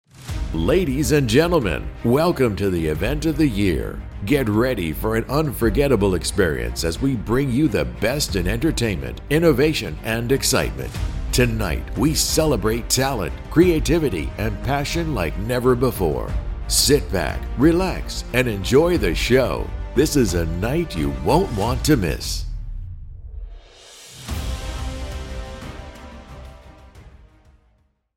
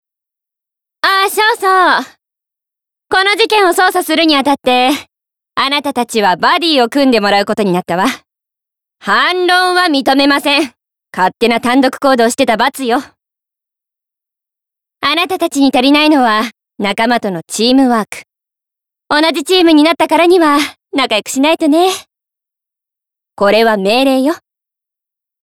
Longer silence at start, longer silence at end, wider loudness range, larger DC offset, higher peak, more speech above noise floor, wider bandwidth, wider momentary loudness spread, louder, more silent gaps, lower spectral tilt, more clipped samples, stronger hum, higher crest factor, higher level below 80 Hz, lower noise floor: second, 0.2 s vs 1.05 s; about the same, 1.05 s vs 1.05 s; first, 13 LU vs 3 LU; neither; about the same, -2 dBFS vs 0 dBFS; second, 42 dB vs 73 dB; about the same, 17 kHz vs 17 kHz; first, 15 LU vs 8 LU; second, -20 LUFS vs -11 LUFS; neither; first, -5 dB/octave vs -3.5 dB/octave; neither; neither; first, 18 dB vs 12 dB; first, -30 dBFS vs -54 dBFS; second, -62 dBFS vs -84 dBFS